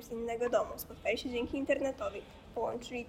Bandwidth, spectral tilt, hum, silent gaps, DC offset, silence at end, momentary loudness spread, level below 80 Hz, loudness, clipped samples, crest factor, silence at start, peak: 16 kHz; -4.5 dB/octave; none; none; under 0.1%; 0 s; 8 LU; -58 dBFS; -36 LUFS; under 0.1%; 18 dB; 0 s; -18 dBFS